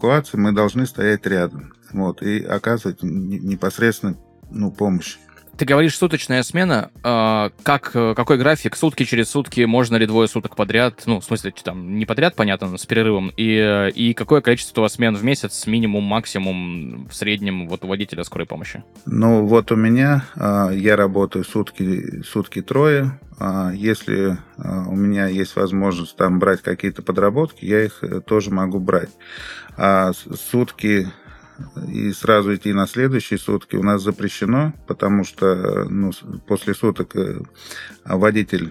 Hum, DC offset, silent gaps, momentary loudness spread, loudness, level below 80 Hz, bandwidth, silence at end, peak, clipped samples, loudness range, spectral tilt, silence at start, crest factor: none; under 0.1%; none; 11 LU; -19 LUFS; -50 dBFS; 15.5 kHz; 0 s; 0 dBFS; under 0.1%; 4 LU; -6 dB/octave; 0 s; 18 dB